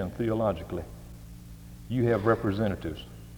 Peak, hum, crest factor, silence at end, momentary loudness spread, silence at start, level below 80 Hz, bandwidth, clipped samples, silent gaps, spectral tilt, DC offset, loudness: -8 dBFS; none; 22 dB; 0 s; 22 LU; 0 s; -48 dBFS; over 20 kHz; under 0.1%; none; -8 dB/octave; under 0.1%; -29 LUFS